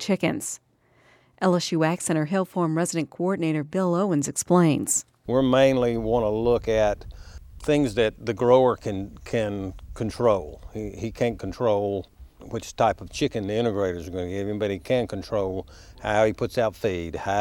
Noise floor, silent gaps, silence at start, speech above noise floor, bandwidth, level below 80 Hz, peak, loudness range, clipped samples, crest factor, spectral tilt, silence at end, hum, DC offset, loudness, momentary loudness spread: -60 dBFS; none; 0 s; 36 dB; 16.5 kHz; -46 dBFS; -4 dBFS; 5 LU; under 0.1%; 20 dB; -5.5 dB/octave; 0 s; none; under 0.1%; -24 LUFS; 13 LU